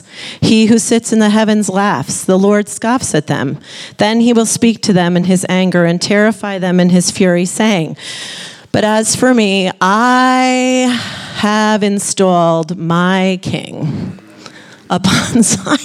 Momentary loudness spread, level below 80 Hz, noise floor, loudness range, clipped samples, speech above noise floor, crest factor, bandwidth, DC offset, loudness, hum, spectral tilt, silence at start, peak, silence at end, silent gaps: 10 LU; -50 dBFS; -36 dBFS; 2 LU; under 0.1%; 24 dB; 12 dB; 14.5 kHz; under 0.1%; -12 LUFS; none; -4.5 dB/octave; 0.15 s; 0 dBFS; 0 s; none